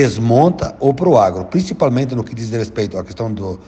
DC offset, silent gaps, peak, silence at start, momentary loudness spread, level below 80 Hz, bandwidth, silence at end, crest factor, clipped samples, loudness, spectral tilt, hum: under 0.1%; none; -2 dBFS; 0 s; 11 LU; -42 dBFS; 8.6 kHz; 0.05 s; 14 dB; under 0.1%; -16 LUFS; -7.5 dB/octave; none